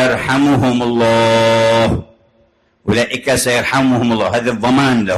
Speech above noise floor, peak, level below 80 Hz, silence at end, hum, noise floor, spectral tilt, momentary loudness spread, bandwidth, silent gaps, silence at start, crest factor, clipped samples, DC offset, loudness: 42 dB; -4 dBFS; -38 dBFS; 0 s; none; -55 dBFS; -5 dB/octave; 5 LU; 13 kHz; none; 0 s; 10 dB; under 0.1%; under 0.1%; -13 LUFS